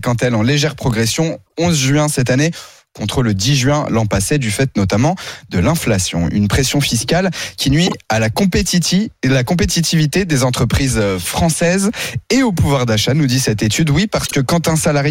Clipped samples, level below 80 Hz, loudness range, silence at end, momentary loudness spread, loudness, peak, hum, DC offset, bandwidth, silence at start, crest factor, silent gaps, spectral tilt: under 0.1%; -34 dBFS; 1 LU; 0 s; 4 LU; -15 LUFS; -4 dBFS; none; under 0.1%; 16.5 kHz; 0 s; 10 dB; none; -4.5 dB/octave